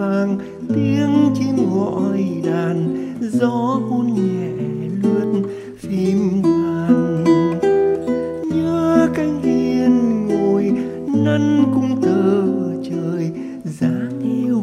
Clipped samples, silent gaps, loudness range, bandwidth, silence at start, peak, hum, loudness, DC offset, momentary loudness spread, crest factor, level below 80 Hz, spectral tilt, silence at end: under 0.1%; none; 3 LU; 11 kHz; 0 s; -2 dBFS; none; -18 LUFS; under 0.1%; 7 LU; 16 dB; -52 dBFS; -8 dB/octave; 0 s